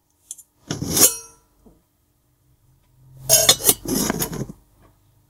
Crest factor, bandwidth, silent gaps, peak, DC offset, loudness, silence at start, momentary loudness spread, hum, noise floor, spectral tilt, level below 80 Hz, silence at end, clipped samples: 24 dB; 17 kHz; none; 0 dBFS; under 0.1%; -16 LUFS; 0.3 s; 25 LU; none; -64 dBFS; -1.5 dB/octave; -48 dBFS; 0.8 s; under 0.1%